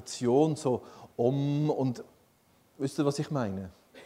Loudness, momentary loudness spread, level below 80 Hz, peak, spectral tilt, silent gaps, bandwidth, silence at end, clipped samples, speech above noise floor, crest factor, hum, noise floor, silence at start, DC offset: -30 LUFS; 15 LU; -70 dBFS; -12 dBFS; -7 dB/octave; none; 14.5 kHz; 0 s; under 0.1%; 36 dB; 18 dB; none; -65 dBFS; 0 s; under 0.1%